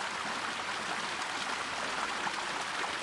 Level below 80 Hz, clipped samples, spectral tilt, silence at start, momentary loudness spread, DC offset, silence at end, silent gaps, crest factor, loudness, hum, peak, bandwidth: -70 dBFS; under 0.1%; -1 dB/octave; 0 s; 1 LU; under 0.1%; 0 s; none; 16 dB; -34 LUFS; none; -18 dBFS; 11.5 kHz